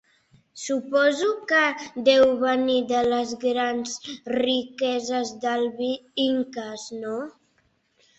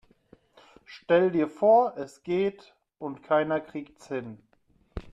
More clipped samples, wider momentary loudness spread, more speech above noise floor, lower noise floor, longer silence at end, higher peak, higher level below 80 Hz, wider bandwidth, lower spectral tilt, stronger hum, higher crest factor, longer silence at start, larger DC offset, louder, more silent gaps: neither; second, 12 LU vs 23 LU; first, 44 dB vs 40 dB; about the same, -67 dBFS vs -66 dBFS; first, 0.9 s vs 0.05 s; first, -6 dBFS vs -10 dBFS; second, -64 dBFS vs -56 dBFS; second, 8.2 kHz vs 10 kHz; second, -2.5 dB/octave vs -7 dB/octave; neither; about the same, 18 dB vs 18 dB; second, 0.55 s vs 0.9 s; neither; about the same, -24 LUFS vs -26 LUFS; neither